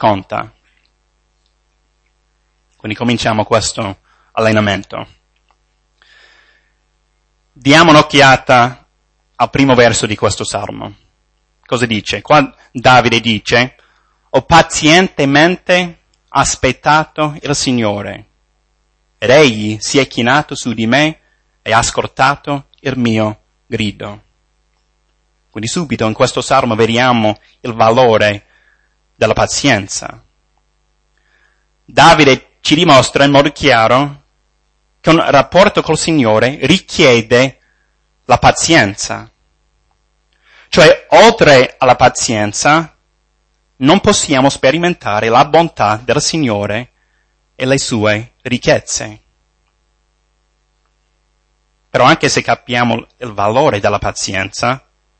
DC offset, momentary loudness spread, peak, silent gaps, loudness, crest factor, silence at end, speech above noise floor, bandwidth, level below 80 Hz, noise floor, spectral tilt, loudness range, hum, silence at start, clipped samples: under 0.1%; 14 LU; 0 dBFS; none; -11 LUFS; 14 dB; 0.4 s; 49 dB; 11 kHz; -40 dBFS; -60 dBFS; -4 dB/octave; 9 LU; none; 0 s; 0.2%